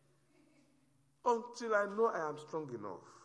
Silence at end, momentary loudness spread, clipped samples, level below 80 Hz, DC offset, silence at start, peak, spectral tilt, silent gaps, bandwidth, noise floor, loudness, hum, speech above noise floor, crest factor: 0.05 s; 11 LU; under 0.1%; -86 dBFS; under 0.1%; 1.25 s; -18 dBFS; -5 dB/octave; none; 10.5 kHz; -73 dBFS; -37 LUFS; none; 36 dB; 20 dB